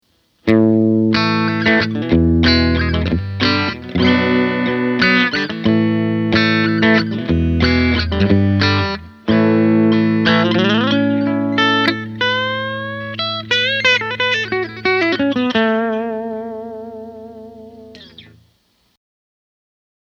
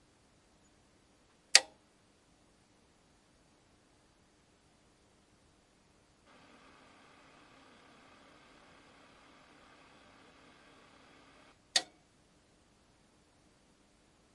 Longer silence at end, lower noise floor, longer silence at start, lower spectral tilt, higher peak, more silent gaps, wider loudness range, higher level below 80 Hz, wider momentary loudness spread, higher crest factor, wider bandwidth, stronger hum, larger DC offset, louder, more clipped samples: second, 1.85 s vs 2.5 s; second, -60 dBFS vs -68 dBFS; second, 0.45 s vs 1.55 s; first, -6.5 dB/octave vs 2 dB/octave; first, 0 dBFS vs -4 dBFS; neither; second, 5 LU vs 26 LU; first, -34 dBFS vs -78 dBFS; second, 10 LU vs 34 LU; second, 16 dB vs 40 dB; second, 7 kHz vs 11 kHz; neither; neither; first, -15 LUFS vs -28 LUFS; neither